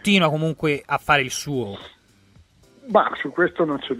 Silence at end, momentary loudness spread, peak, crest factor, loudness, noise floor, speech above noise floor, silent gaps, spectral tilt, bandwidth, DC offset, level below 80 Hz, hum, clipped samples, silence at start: 0 s; 10 LU; -2 dBFS; 20 dB; -21 LUFS; -54 dBFS; 33 dB; none; -5 dB/octave; 16 kHz; under 0.1%; -56 dBFS; none; under 0.1%; 0.05 s